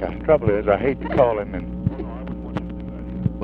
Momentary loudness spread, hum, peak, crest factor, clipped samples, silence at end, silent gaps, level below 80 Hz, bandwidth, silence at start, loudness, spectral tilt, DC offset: 13 LU; none; -4 dBFS; 18 dB; under 0.1%; 0 s; none; -36 dBFS; 5 kHz; 0 s; -23 LUFS; -10 dB/octave; under 0.1%